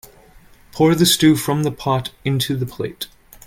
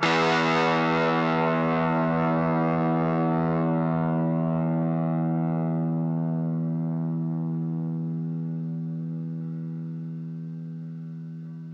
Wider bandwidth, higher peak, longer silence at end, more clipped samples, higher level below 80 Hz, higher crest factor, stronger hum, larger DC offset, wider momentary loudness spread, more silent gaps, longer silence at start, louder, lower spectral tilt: first, 17 kHz vs 7.6 kHz; first, -2 dBFS vs -8 dBFS; first, 0.4 s vs 0 s; neither; first, -48 dBFS vs -62 dBFS; about the same, 16 dB vs 18 dB; neither; neither; first, 16 LU vs 13 LU; neither; first, 0.75 s vs 0 s; first, -18 LUFS vs -26 LUFS; second, -4.5 dB/octave vs -7.5 dB/octave